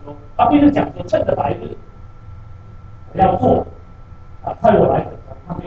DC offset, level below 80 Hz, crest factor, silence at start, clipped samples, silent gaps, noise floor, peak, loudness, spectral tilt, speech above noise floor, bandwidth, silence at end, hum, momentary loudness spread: under 0.1%; -38 dBFS; 18 dB; 0 s; under 0.1%; none; -37 dBFS; 0 dBFS; -16 LUFS; -9 dB/octave; 22 dB; 7 kHz; 0 s; none; 19 LU